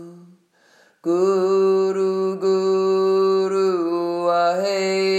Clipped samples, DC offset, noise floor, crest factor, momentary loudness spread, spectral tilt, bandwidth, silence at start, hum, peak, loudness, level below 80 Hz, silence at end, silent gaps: under 0.1%; under 0.1%; -56 dBFS; 12 dB; 4 LU; -5.5 dB/octave; 9.2 kHz; 0 s; none; -8 dBFS; -19 LUFS; -86 dBFS; 0 s; none